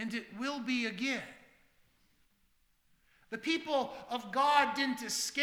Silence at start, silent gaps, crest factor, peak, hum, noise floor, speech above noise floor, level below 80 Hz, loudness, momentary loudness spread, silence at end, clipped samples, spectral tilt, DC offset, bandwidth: 0 s; none; 24 dB; -12 dBFS; none; -72 dBFS; 38 dB; -74 dBFS; -33 LUFS; 12 LU; 0 s; under 0.1%; -2 dB/octave; under 0.1%; 19 kHz